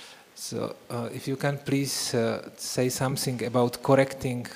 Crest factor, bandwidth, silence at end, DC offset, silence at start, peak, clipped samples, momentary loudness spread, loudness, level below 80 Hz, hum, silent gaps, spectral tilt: 20 dB; 15.5 kHz; 0 s; under 0.1%; 0 s; -6 dBFS; under 0.1%; 11 LU; -28 LUFS; -60 dBFS; none; none; -5 dB/octave